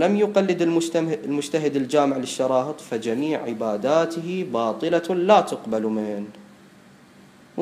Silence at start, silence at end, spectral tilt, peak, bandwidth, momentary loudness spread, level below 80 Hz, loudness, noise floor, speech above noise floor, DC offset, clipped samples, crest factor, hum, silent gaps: 0 s; 0 s; -5.5 dB/octave; -2 dBFS; 15.5 kHz; 9 LU; -72 dBFS; -23 LUFS; -50 dBFS; 28 dB; under 0.1%; under 0.1%; 20 dB; none; none